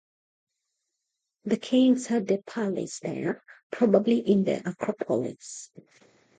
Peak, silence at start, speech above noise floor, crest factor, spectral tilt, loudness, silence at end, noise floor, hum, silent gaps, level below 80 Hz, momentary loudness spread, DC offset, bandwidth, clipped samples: -8 dBFS; 1.45 s; 57 dB; 20 dB; -6 dB/octave; -26 LUFS; 0.75 s; -83 dBFS; none; 3.63-3.70 s; -74 dBFS; 17 LU; under 0.1%; 9.4 kHz; under 0.1%